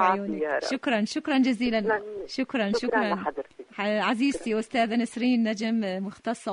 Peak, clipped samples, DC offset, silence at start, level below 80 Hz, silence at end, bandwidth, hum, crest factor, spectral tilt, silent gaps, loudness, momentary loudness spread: -8 dBFS; under 0.1%; under 0.1%; 0 s; -62 dBFS; 0 s; 10.5 kHz; none; 18 dB; -5 dB/octave; none; -27 LUFS; 8 LU